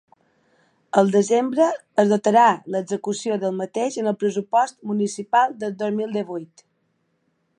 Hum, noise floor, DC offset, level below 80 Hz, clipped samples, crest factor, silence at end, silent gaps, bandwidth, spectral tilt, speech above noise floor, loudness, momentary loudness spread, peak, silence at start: none; -69 dBFS; under 0.1%; -76 dBFS; under 0.1%; 20 dB; 1.15 s; none; 10.5 kHz; -5.5 dB/octave; 49 dB; -21 LUFS; 9 LU; -2 dBFS; 0.95 s